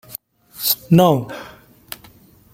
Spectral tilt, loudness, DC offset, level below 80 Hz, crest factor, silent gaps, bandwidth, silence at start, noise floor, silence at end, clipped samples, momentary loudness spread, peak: -5.5 dB/octave; -16 LUFS; under 0.1%; -54 dBFS; 18 dB; none; 16.5 kHz; 0.1 s; -48 dBFS; 1.05 s; under 0.1%; 22 LU; -2 dBFS